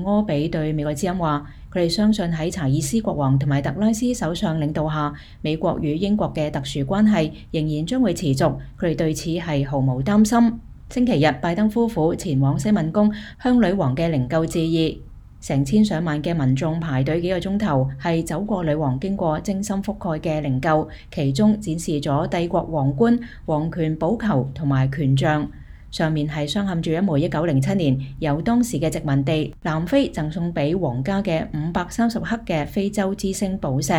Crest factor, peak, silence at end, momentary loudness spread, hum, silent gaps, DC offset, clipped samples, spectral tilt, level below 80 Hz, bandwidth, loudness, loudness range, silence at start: 16 dB; -6 dBFS; 0 s; 6 LU; none; none; under 0.1%; under 0.1%; -6.5 dB/octave; -40 dBFS; 15.5 kHz; -21 LUFS; 3 LU; 0 s